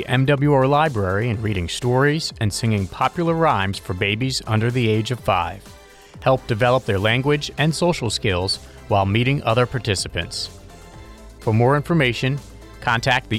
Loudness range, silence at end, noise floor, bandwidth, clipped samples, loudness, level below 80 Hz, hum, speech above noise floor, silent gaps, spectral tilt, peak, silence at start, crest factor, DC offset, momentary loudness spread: 2 LU; 0 s; -40 dBFS; 15 kHz; under 0.1%; -20 LUFS; -44 dBFS; none; 21 dB; none; -5.5 dB/octave; -6 dBFS; 0 s; 14 dB; under 0.1%; 7 LU